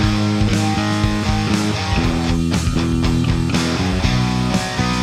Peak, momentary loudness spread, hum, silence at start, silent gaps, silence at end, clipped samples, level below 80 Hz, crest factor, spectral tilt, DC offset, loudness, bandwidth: -4 dBFS; 2 LU; none; 0 s; none; 0 s; under 0.1%; -26 dBFS; 14 dB; -5.5 dB/octave; under 0.1%; -18 LUFS; 14.5 kHz